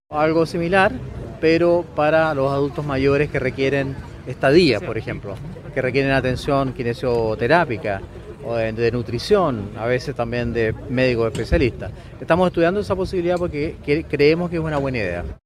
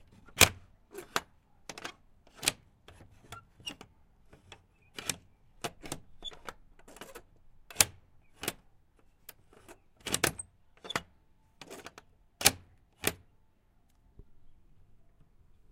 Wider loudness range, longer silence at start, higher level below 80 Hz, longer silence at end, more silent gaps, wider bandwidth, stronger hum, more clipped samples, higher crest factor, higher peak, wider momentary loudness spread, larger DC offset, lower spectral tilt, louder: second, 2 LU vs 10 LU; second, 0.1 s vs 0.35 s; first, -38 dBFS vs -58 dBFS; second, 0.1 s vs 1.2 s; neither; second, 13 kHz vs 16.5 kHz; neither; neither; second, 18 dB vs 36 dB; about the same, -2 dBFS vs -2 dBFS; second, 11 LU vs 26 LU; neither; first, -7 dB/octave vs -1 dB/octave; first, -20 LUFS vs -32 LUFS